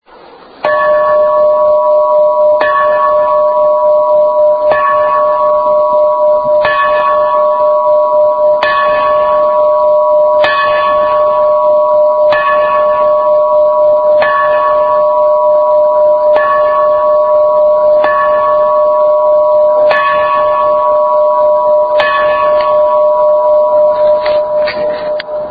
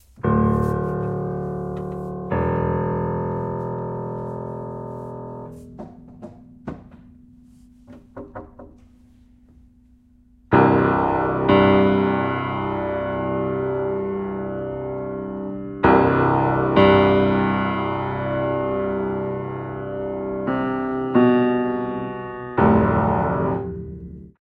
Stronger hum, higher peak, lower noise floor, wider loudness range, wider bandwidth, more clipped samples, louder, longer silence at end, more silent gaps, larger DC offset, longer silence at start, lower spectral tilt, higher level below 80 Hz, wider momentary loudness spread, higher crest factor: neither; about the same, 0 dBFS vs -2 dBFS; second, -36 dBFS vs -54 dBFS; second, 1 LU vs 18 LU; about the same, 5 kHz vs 5.2 kHz; neither; first, -9 LUFS vs -21 LUFS; second, 0 s vs 0.2 s; neither; neither; first, 0.6 s vs 0.2 s; second, -6 dB/octave vs -9.5 dB/octave; about the same, -46 dBFS vs -44 dBFS; second, 1 LU vs 21 LU; second, 8 dB vs 20 dB